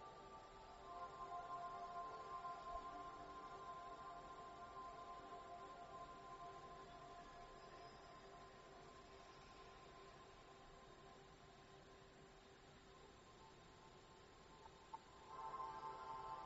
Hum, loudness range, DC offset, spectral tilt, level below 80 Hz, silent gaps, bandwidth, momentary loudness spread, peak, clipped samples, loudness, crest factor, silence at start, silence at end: none; 11 LU; under 0.1%; -3 dB/octave; -72 dBFS; none; 7.6 kHz; 13 LU; -38 dBFS; under 0.1%; -57 LUFS; 18 dB; 0 s; 0 s